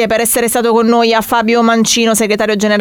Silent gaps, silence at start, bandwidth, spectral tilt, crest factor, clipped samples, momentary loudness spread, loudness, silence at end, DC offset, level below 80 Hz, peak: none; 0 s; 19 kHz; -3 dB/octave; 10 dB; under 0.1%; 2 LU; -11 LUFS; 0 s; under 0.1%; -46 dBFS; 0 dBFS